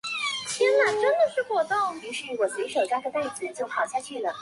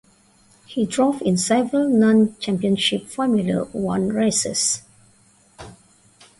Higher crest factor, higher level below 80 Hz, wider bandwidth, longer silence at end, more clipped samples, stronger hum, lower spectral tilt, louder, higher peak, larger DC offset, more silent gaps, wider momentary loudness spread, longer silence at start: about the same, 14 dB vs 14 dB; second, -74 dBFS vs -56 dBFS; about the same, 11.5 kHz vs 11.5 kHz; second, 0 s vs 0.65 s; neither; neither; second, -1.5 dB/octave vs -4 dB/octave; second, -26 LUFS vs -20 LUFS; second, -12 dBFS vs -6 dBFS; neither; neither; first, 10 LU vs 7 LU; second, 0.05 s vs 0.7 s